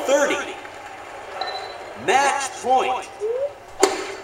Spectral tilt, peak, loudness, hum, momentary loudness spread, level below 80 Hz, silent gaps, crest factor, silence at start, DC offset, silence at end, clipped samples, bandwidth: -1.5 dB/octave; 0 dBFS; -22 LUFS; none; 16 LU; -60 dBFS; none; 24 dB; 0 s; under 0.1%; 0 s; under 0.1%; 16 kHz